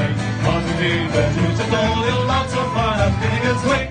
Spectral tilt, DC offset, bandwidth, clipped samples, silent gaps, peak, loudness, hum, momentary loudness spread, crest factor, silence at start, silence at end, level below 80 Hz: -6 dB/octave; under 0.1%; 9.8 kHz; under 0.1%; none; -4 dBFS; -19 LUFS; none; 2 LU; 14 dB; 0 s; 0 s; -32 dBFS